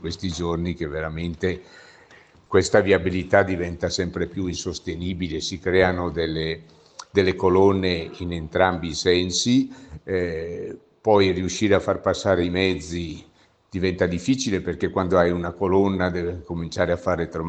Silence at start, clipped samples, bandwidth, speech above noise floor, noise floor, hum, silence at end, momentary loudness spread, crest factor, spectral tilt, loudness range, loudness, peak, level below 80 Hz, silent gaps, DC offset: 0 s; under 0.1%; 9 kHz; 29 dB; -52 dBFS; none; 0 s; 12 LU; 20 dB; -5 dB/octave; 2 LU; -23 LUFS; -2 dBFS; -50 dBFS; none; under 0.1%